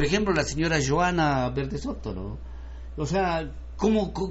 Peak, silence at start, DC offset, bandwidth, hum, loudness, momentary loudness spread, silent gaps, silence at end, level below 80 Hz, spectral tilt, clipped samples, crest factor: -10 dBFS; 0 s; under 0.1%; 8 kHz; none; -26 LUFS; 15 LU; none; 0 s; -38 dBFS; -5 dB/octave; under 0.1%; 16 dB